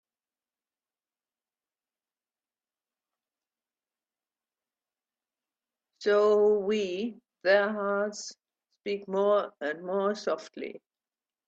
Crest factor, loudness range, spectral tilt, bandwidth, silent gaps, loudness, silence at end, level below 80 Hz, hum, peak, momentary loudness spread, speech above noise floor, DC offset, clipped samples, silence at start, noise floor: 22 dB; 4 LU; -4.5 dB/octave; 8 kHz; none; -28 LUFS; 0.7 s; -80 dBFS; none; -10 dBFS; 17 LU; over 63 dB; under 0.1%; under 0.1%; 6 s; under -90 dBFS